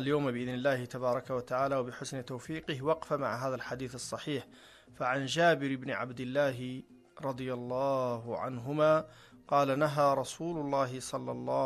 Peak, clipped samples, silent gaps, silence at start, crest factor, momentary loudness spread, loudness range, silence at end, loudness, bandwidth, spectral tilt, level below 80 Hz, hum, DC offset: -14 dBFS; under 0.1%; none; 0 s; 18 dB; 12 LU; 4 LU; 0 s; -33 LUFS; 13 kHz; -5.5 dB/octave; -66 dBFS; none; under 0.1%